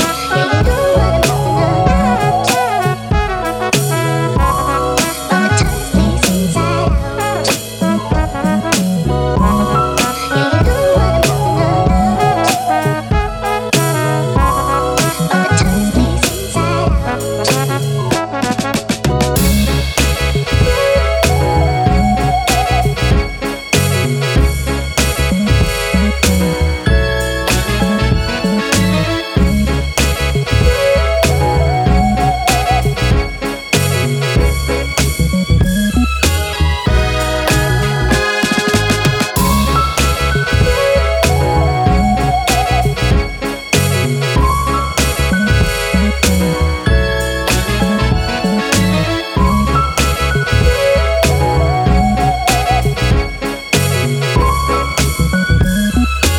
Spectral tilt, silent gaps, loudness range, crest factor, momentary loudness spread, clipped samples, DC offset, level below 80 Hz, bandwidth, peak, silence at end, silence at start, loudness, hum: -5 dB/octave; none; 2 LU; 12 dB; 3 LU; under 0.1%; under 0.1%; -20 dBFS; 19.5 kHz; 0 dBFS; 0 s; 0 s; -14 LUFS; none